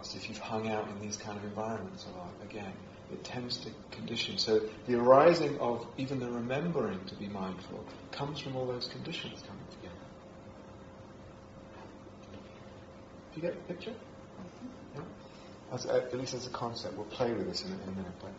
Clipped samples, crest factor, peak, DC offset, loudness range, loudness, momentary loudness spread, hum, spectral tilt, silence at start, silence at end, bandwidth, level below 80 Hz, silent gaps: under 0.1%; 26 dB; -10 dBFS; under 0.1%; 17 LU; -34 LUFS; 20 LU; none; -4 dB/octave; 0 s; 0 s; 7.6 kHz; -64 dBFS; none